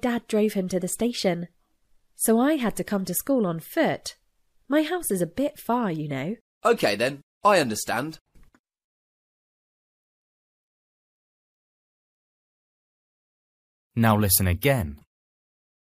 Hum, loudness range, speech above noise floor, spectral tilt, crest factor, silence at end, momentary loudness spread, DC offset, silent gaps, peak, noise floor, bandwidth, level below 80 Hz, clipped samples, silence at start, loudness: none; 4 LU; 39 dB; -4.5 dB/octave; 24 dB; 1.05 s; 10 LU; under 0.1%; 6.41-6.61 s, 7.23-7.41 s, 8.21-8.25 s, 8.60-8.64 s, 8.84-13.90 s; -4 dBFS; -63 dBFS; 15.5 kHz; -52 dBFS; under 0.1%; 0.05 s; -24 LUFS